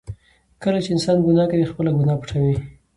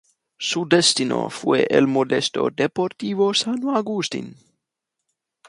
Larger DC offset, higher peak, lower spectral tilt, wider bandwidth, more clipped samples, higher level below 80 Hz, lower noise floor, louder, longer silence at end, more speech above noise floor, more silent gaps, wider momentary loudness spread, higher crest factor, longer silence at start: neither; second, -6 dBFS vs -2 dBFS; first, -7.5 dB/octave vs -3.5 dB/octave; about the same, 11.5 kHz vs 11.5 kHz; neither; first, -46 dBFS vs -66 dBFS; second, -40 dBFS vs -82 dBFS; about the same, -20 LUFS vs -20 LUFS; second, 0.25 s vs 1.15 s; second, 22 dB vs 61 dB; neither; about the same, 10 LU vs 9 LU; second, 14 dB vs 20 dB; second, 0.1 s vs 0.4 s